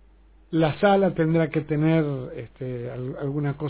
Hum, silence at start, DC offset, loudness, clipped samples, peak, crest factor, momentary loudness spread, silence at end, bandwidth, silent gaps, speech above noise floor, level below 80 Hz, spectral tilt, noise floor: none; 0.5 s; under 0.1%; -24 LUFS; under 0.1%; -8 dBFS; 16 dB; 13 LU; 0 s; 4 kHz; none; 30 dB; -52 dBFS; -11.5 dB/octave; -53 dBFS